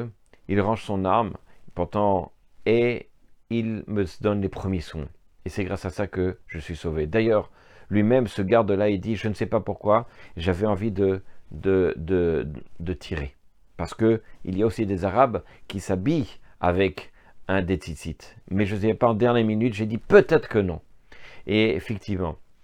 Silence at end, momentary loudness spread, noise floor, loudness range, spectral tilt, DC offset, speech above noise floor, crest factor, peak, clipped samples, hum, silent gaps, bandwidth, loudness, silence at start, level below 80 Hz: 0.2 s; 15 LU; -44 dBFS; 5 LU; -7.5 dB/octave; under 0.1%; 20 dB; 22 dB; -2 dBFS; under 0.1%; none; none; 12 kHz; -24 LUFS; 0 s; -48 dBFS